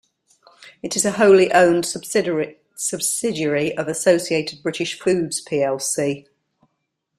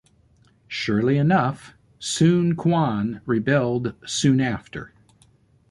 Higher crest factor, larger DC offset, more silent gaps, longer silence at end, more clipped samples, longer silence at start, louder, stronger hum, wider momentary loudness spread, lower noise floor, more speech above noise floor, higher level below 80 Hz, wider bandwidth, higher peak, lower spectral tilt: about the same, 18 dB vs 16 dB; neither; neither; first, 1 s vs 0.85 s; neither; about the same, 0.65 s vs 0.7 s; first, -19 LUFS vs -22 LUFS; neither; about the same, 12 LU vs 14 LU; first, -75 dBFS vs -58 dBFS; first, 56 dB vs 37 dB; second, -62 dBFS vs -54 dBFS; first, 14 kHz vs 11.5 kHz; first, -2 dBFS vs -6 dBFS; second, -3.5 dB/octave vs -6 dB/octave